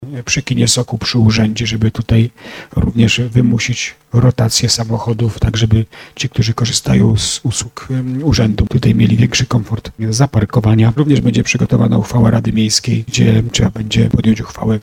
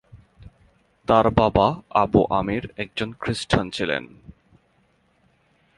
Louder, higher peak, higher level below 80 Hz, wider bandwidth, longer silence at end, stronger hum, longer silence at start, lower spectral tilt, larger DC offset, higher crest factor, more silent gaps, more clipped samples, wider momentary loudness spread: first, -14 LUFS vs -22 LUFS; about the same, 0 dBFS vs 0 dBFS; first, -32 dBFS vs -42 dBFS; first, 14.5 kHz vs 11.5 kHz; second, 0 s vs 1.45 s; neither; second, 0 s vs 0.15 s; about the same, -5 dB/octave vs -6 dB/octave; neither; second, 12 dB vs 22 dB; neither; neither; second, 7 LU vs 11 LU